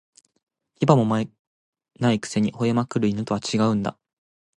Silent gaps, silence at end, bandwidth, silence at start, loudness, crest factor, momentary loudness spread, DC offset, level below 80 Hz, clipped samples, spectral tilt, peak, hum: 1.39-1.73 s; 0.65 s; 11 kHz; 0.8 s; -23 LUFS; 22 dB; 7 LU; under 0.1%; -58 dBFS; under 0.1%; -6.5 dB/octave; -2 dBFS; none